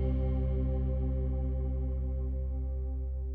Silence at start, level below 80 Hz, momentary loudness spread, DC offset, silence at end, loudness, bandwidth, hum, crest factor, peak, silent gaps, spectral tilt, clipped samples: 0 s; -32 dBFS; 5 LU; under 0.1%; 0 s; -34 LUFS; 2.4 kHz; none; 10 dB; -20 dBFS; none; -12 dB/octave; under 0.1%